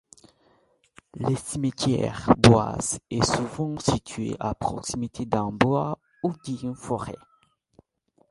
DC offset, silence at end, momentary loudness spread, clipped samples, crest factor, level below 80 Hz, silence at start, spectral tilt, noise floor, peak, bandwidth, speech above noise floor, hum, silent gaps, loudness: under 0.1%; 1.15 s; 14 LU; under 0.1%; 26 dB; -48 dBFS; 1.15 s; -5.5 dB/octave; -66 dBFS; 0 dBFS; 11.5 kHz; 42 dB; none; none; -25 LUFS